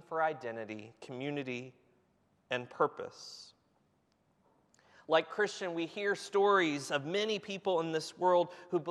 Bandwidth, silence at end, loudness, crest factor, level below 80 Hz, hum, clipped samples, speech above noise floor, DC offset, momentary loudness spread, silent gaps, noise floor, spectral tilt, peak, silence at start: 12.5 kHz; 0 s; -34 LUFS; 20 dB; -86 dBFS; none; under 0.1%; 40 dB; under 0.1%; 16 LU; none; -74 dBFS; -4.5 dB/octave; -16 dBFS; 0.1 s